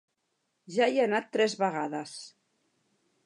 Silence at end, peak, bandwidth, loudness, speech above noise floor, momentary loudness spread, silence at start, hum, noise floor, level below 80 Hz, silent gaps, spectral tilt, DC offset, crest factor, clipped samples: 0.95 s; -12 dBFS; 11.5 kHz; -29 LUFS; 50 dB; 17 LU; 0.7 s; none; -79 dBFS; -86 dBFS; none; -4 dB/octave; under 0.1%; 20 dB; under 0.1%